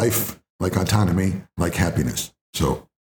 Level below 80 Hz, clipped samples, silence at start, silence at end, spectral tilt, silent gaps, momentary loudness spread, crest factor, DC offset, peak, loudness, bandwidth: -40 dBFS; under 0.1%; 0 s; 0.25 s; -5 dB/octave; 0.50-0.59 s, 2.41-2.53 s; 9 LU; 18 dB; under 0.1%; -4 dBFS; -23 LUFS; over 20 kHz